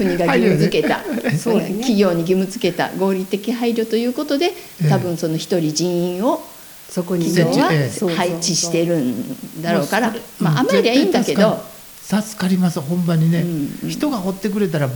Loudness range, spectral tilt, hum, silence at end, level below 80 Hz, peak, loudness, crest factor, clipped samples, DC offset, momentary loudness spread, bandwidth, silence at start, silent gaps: 2 LU; -5.5 dB/octave; none; 0 s; -54 dBFS; -2 dBFS; -18 LUFS; 16 dB; under 0.1%; under 0.1%; 7 LU; over 20 kHz; 0 s; none